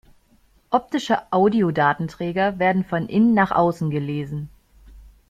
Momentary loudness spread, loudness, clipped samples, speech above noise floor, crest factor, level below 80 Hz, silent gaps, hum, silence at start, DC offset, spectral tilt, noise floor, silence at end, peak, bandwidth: 10 LU; -21 LUFS; under 0.1%; 38 dB; 16 dB; -52 dBFS; none; none; 0.7 s; under 0.1%; -7.5 dB/octave; -58 dBFS; 0.25 s; -4 dBFS; 9.4 kHz